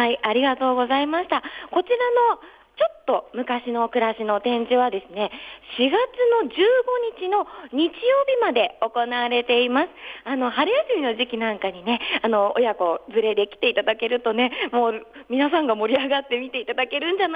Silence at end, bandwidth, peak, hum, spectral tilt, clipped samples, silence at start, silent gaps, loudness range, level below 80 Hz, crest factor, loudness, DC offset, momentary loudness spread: 0 s; 5 kHz; -6 dBFS; none; -6 dB/octave; under 0.1%; 0 s; none; 2 LU; -64 dBFS; 16 dB; -22 LUFS; under 0.1%; 7 LU